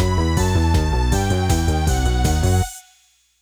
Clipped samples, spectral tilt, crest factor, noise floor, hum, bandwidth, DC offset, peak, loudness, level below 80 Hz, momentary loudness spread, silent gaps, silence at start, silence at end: under 0.1%; -5.5 dB/octave; 12 dB; -58 dBFS; 60 Hz at -35 dBFS; over 20 kHz; under 0.1%; -6 dBFS; -19 LUFS; -22 dBFS; 2 LU; none; 0 s; 0.6 s